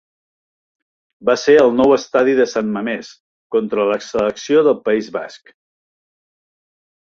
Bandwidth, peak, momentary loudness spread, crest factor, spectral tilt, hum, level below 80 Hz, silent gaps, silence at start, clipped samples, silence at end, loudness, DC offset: 7.4 kHz; -2 dBFS; 12 LU; 16 dB; -5 dB/octave; none; -58 dBFS; 3.20-3.50 s; 1.2 s; under 0.1%; 1.7 s; -16 LUFS; under 0.1%